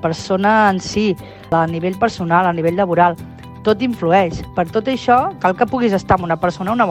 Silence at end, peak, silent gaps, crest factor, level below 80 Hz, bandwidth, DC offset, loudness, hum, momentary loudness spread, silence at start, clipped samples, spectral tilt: 0 s; 0 dBFS; none; 16 dB; -42 dBFS; 15.5 kHz; under 0.1%; -16 LUFS; none; 6 LU; 0 s; under 0.1%; -6 dB/octave